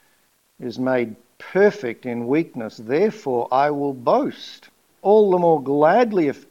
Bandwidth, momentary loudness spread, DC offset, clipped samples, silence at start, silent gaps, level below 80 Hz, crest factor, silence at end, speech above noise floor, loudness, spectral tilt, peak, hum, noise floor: 7.4 kHz; 15 LU; under 0.1%; under 0.1%; 0.6 s; none; -74 dBFS; 18 dB; 0.15 s; 43 dB; -20 LUFS; -7 dB/octave; -2 dBFS; none; -62 dBFS